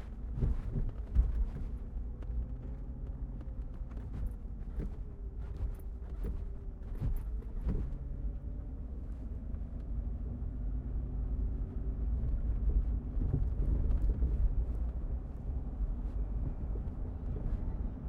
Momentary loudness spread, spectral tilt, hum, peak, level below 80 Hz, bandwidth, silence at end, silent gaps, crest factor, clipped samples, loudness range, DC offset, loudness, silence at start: 10 LU; -10.5 dB/octave; none; -16 dBFS; -36 dBFS; 2.5 kHz; 0 s; none; 18 dB; under 0.1%; 8 LU; under 0.1%; -39 LUFS; 0 s